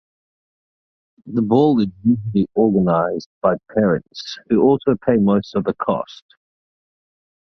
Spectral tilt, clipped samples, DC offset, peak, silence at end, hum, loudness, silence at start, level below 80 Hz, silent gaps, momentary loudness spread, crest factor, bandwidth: -8.5 dB/octave; under 0.1%; under 0.1%; -2 dBFS; 1.35 s; none; -18 LUFS; 1.25 s; -52 dBFS; 3.26-3.41 s; 9 LU; 18 dB; 6.4 kHz